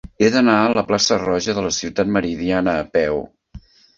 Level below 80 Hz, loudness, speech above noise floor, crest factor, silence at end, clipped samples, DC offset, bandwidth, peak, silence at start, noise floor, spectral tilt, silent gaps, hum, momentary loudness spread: -46 dBFS; -18 LUFS; 24 dB; 16 dB; 0.4 s; under 0.1%; under 0.1%; 7.6 kHz; -2 dBFS; 0.2 s; -42 dBFS; -4 dB/octave; none; none; 7 LU